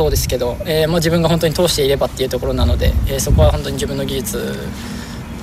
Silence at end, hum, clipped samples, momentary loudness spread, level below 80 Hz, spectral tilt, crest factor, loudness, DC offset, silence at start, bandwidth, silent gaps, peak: 0 s; none; under 0.1%; 12 LU; -22 dBFS; -5 dB/octave; 16 dB; -17 LUFS; under 0.1%; 0 s; 16 kHz; none; 0 dBFS